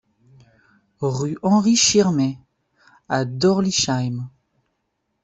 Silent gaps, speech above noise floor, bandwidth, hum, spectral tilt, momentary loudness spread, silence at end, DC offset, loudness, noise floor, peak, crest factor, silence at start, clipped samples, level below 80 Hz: none; 55 dB; 8.4 kHz; none; -4 dB/octave; 13 LU; 0.95 s; under 0.1%; -19 LUFS; -74 dBFS; -4 dBFS; 18 dB; 1 s; under 0.1%; -56 dBFS